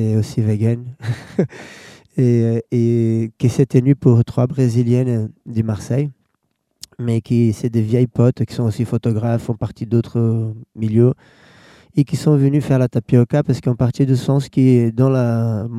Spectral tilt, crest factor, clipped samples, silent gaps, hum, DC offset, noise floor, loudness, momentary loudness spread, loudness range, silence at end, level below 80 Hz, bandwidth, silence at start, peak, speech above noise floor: -8.5 dB/octave; 16 dB; under 0.1%; none; none; under 0.1%; -69 dBFS; -17 LUFS; 10 LU; 4 LU; 0 s; -50 dBFS; 11.5 kHz; 0 s; 0 dBFS; 53 dB